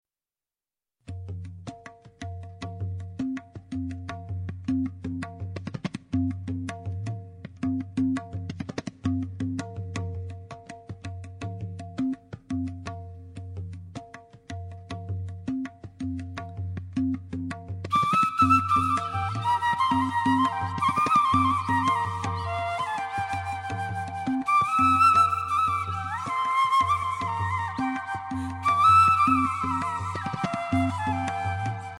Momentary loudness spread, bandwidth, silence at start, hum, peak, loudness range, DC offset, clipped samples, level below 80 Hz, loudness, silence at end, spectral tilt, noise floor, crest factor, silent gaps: 18 LU; 16 kHz; 1.05 s; none; -10 dBFS; 13 LU; under 0.1%; under 0.1%; -54 dBFS; -26 LUFS; 0 s; -6 dB/octave; under -90 dBFS; 18 dB; none